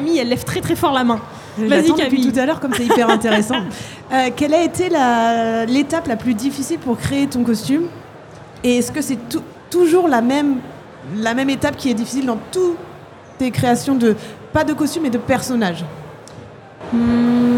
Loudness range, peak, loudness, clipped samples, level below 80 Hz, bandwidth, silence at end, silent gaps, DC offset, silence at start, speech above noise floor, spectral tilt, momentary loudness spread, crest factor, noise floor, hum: 4 LU; 0 dBFS; -17 LUFS; under 0.1%; -50 dBFS; 17 kHz; 0 s; none; under 0.1%; 0 s; 22 dB; -5 dB/octave; 13 LU; 16 dB; -38 dBFS; none